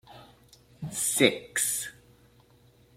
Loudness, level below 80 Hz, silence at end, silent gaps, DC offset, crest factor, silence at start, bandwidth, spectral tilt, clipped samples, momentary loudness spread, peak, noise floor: -26 LUFS; -66 dBFS; 1.05 s; none; under 0.1%; 28 dB; 0.1 s; 16.5 kHz; -2 dB/octave; under 0.1%; 16 LU; -4 dBFS; -60 dBFS